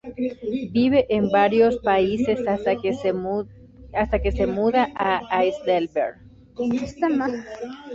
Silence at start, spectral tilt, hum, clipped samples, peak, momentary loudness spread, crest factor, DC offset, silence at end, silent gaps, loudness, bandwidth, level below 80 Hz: 0.05 s; -7 dB/octave; none; under 0.1%; -4 dBFS; 11 LU; 18 dB; under 0.1%; 0 s; none; -22 LUFS; 7.8 kHz; -40 dBFS